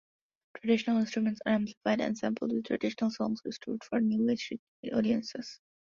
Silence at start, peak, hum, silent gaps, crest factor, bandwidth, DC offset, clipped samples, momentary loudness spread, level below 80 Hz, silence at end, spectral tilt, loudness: 0.55 s; -14 dBFS; none; 1.77-1.81 s, 4.59-4.83 s; 18 dB; 7.2 kHz; under 0.1%; under 0.1%; 10 LU; -72 dBFS; 0.4 s; -6 dB/octave; -32 LUFS